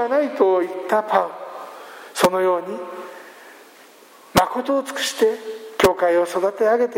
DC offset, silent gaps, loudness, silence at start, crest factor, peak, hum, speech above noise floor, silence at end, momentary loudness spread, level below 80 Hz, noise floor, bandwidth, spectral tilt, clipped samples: under 0.1%; none; -20 LUFS; 0 s; 20 dB; 0 dBFS; none; 28 dB; 0 s; 18 LU; -52 dBFS; -47 dBFS; 16.5 kHz; -4 dB/octave; under 0.1%